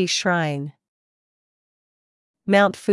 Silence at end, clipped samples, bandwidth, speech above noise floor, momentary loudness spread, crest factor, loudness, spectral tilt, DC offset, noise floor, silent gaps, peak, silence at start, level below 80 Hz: 0 s; under 0.1%; 12 kHz; over 70 dB; 17 LU; 18 dB; -20 LUFS; -4.5 dB/octave; under 0.1%; under -90 dBFS; 0.89-2.34 s; -4 dBFS; 0 s; -74 dBFS